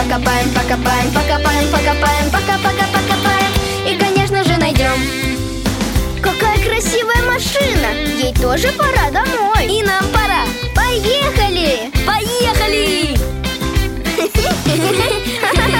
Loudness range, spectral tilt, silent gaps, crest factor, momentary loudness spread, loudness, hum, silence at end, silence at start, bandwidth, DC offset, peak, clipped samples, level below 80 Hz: 1 LU; -4 dB/octave; none; 14 dB; 4 LU; -14 LUFS; none; 0 s; 0 s; 17 kHz; under 0.1%; -2 dBFS; under 0.1%; -22 dBFS